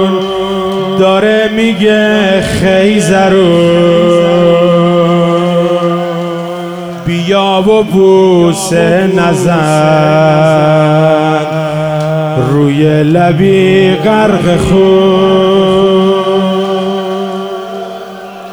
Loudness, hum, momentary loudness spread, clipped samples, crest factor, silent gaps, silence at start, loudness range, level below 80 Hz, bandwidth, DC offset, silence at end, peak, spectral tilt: -9 LUFS; none; 9 LU; 0.4%; 8 dB; none; 0 s; 3 LU; -38 dBFS; over 20 kHz; under 0.1%; 0 s; 0 dBFS; -6 dB/octave